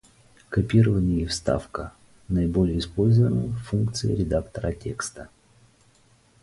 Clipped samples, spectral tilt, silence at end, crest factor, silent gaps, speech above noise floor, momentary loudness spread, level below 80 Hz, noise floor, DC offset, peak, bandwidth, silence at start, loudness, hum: under 0.1%; -7 dB/octave; 1.15 s; 18 dB; none; 36 dB; 13 LU; -40 dBFS; -59 dBFS; under 0.1%; -8 dBFS; 11.5 kHz; 0.5 s; -24 LUFS; none